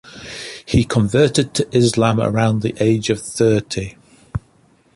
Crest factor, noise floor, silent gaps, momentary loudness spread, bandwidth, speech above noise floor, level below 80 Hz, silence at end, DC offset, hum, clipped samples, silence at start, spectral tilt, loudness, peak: 16 dB; -55 dBFS; none; 15 LU; 11.5 kHz; 38 dB; -40 dBFS; 0.55 s; under 0.1%; none; under 0.1%; 0.05 s; -5.5 dB/octave; -17 LUFS; -2 dBFS